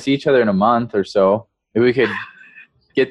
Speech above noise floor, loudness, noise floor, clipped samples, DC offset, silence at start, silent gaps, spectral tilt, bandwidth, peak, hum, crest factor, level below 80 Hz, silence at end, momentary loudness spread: 30 dB; -17 LUFS; -46 dBFS; under 0.1%; under 0.1%; 0 s; none; -7 dB/octave; 9.6 kHz; -2 dBFS; none; 14 dB; -56 dBFS; 0 s; 9 LU